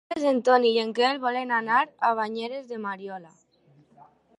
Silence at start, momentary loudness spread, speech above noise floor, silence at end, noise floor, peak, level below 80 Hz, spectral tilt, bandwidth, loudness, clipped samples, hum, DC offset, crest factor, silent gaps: 0.1 s; 13 LU; 36 dB; 1.1 s; -60 dBFS; -6 dBFS; -78 dBFS; -4 dB/octave; 11 kHz; -24 LUFS; under 0.1%; none; under 0.1%; 20 dB; none